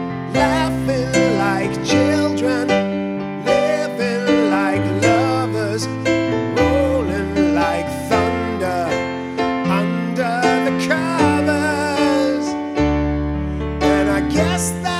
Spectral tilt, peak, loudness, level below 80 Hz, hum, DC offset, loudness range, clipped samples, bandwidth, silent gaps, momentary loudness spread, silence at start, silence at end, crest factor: -5.5 dB/octave; -2 dBFS; -18 LUFS; -34 dBFS; none; under 0.1%; 1 LU; under 0.1%; 15.5 kHz; none; 6 LU; 0 s; 0 s; 16 dB